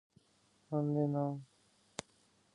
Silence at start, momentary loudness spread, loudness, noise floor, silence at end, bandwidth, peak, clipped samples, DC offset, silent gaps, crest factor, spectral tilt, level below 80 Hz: 0.7 s; 15 LU; -38 LUFS; -72 dBFS; 0.55 s; 11 kHz; -18 dBFS; under 0.1%; under 0.1%; none; 20 dB; -7.5 dB/octave; -80 dBFS